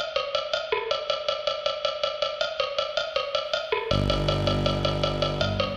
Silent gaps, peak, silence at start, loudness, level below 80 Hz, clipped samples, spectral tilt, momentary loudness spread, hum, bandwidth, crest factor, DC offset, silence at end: none; -10 dBFS; 0 s; -26 LUFS; -40 dBFS; under 0.1%; -5 dB/octave; 3 LU; none; 10.5 kHz; 18 dB; under 0.1%; 0 s